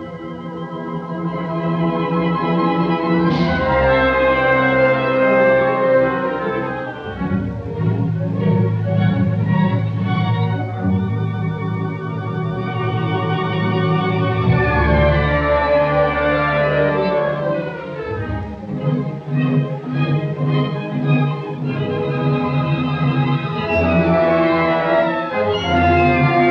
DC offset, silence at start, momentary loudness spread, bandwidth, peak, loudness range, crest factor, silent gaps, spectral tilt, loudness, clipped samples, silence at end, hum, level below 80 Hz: under 0.1%; 0 s; 10 LU; 6.2 kHz; -2 dBFS; 5 LU; 14 dB; none; -9 dB/octave; -18 LUFS; under 0.1%; 0 s; none; -34 dBFS